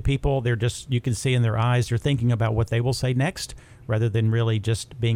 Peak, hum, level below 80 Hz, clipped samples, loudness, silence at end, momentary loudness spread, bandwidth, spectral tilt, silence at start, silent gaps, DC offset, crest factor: -10 dBFS; none; -40 dBFS; under 0.1%; -23 LUFS; 0 s; 5 LU; 13 kHz; -6 dB/octave; 0 s; none; under 0.1%; 12 dB